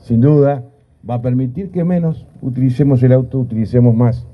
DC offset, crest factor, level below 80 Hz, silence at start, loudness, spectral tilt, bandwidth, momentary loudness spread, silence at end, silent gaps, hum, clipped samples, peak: under 0.1%; 14 dB; -42 dBFS; 0.05 s; -15 LUFS; -11.5 dB/octave; 5.2 kHz; 11 LU; 0.05 s; none; none; under 0.1%; 0 dBFS